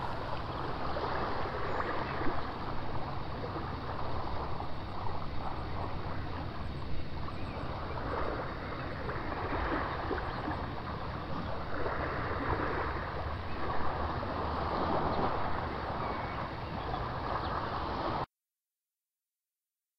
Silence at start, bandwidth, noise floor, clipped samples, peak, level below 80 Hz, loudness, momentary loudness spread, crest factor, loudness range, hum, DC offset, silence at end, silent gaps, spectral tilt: 0 s; 6.2 kHz; under -90 dBFS; under 0.1%; -18 dBFS; -44 dBFS; -37 LUFS; 6 LU; 16 dB; 4 LU; none; under 0.1%; 1.75 s; none; -7.5 dB/octave